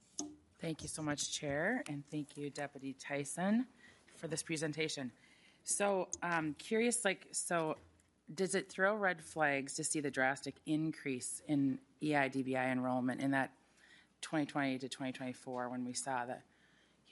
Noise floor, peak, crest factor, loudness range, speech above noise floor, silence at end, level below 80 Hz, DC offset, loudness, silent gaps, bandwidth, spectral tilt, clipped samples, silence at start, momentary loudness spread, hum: -70 dBFS; -18 dBFS; 20 dB; 4 LU; 32 dB; 0.7 s; -78 dBFS; under 0.1%; -38 LUFS; none; 11.5 kHz; -4 dB/octave; under 0.1%; 0.2 s; 11 LU; none